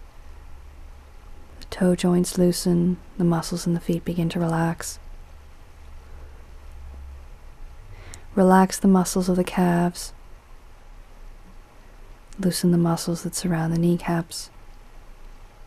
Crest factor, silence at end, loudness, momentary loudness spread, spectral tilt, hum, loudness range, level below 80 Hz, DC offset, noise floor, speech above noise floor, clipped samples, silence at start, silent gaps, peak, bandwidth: 22 dB; 0 s; -22 LUFS; 23 LU; -6 dB/octave; none; 7 LU; -42 dBFS; under 0.1%; -45 dBFS; 23 dB; under 0.1%; 0 s; none; -4 dBFS; 14.5 kHz